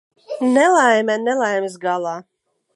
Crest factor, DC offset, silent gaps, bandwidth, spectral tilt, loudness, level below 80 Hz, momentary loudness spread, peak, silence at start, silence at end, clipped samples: 16 dB; under 0.1%; none; 11.5 kHz; -3.5 dB/octave; -17 LUFS; -78 dBFS; 14 LU; -2 dBFS; 0.3 s; 0.55 s; under 0.1%